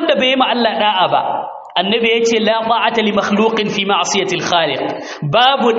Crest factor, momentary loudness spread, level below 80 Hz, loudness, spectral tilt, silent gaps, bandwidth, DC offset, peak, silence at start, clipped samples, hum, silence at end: 14 dB; 7 LU; -58 dBFS; -14 LUFS; -2 dB/octave; none; 8 kHz; under 0.1%; 0 dBFS; 0 s; under 0.1%; none; 0 s